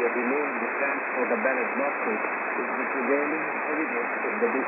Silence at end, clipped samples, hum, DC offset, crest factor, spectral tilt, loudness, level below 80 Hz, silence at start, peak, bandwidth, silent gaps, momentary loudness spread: 0 s; under 0.1%; none; under 0.1%; 16 dB; -9.5 dB/octave; -26 LUFS; under -90 dBFS; 0 s; -12 dBFS; 3.8 kHz; none; 3 LU